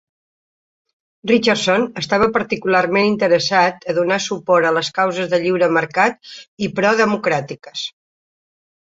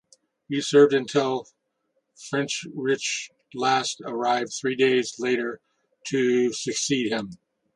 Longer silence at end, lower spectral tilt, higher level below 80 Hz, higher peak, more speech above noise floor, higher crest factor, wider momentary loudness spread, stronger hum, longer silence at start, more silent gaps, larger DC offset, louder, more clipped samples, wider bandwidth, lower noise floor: first, 0.9 s vs 0.4 s; about the same, -4.5 dB/octave vs -3.5 dB/octave; first, -56 dBFS vs -72 dBFS; first, -2 dBFS vs -6 dBFS; first, over 73 dB vs 51 dB; about the same, 16 dB vs 20 dB; about the same, 12 LU vs 12 LU; neither; first, 1.25 s vs 0.5 s; first, 6.48-6.57 s vs none; neither; first, -17 LUFS vs -24 LUFS; neither; second, 8 kHz vs 11 kHz; first, under -90 dBFS vs -74 dBFS